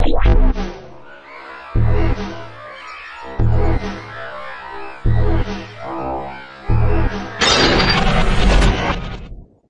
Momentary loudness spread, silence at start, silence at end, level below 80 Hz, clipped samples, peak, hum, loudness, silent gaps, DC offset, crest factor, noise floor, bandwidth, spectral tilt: 19 LU; 0 s; 0.25 s; -20 dBFS; under 0.1%; -2 dBFS; none; -18 LUFS; none; under 0.1%; 14 dB; -38 dBFS; 10 kHz; -5 dB/octave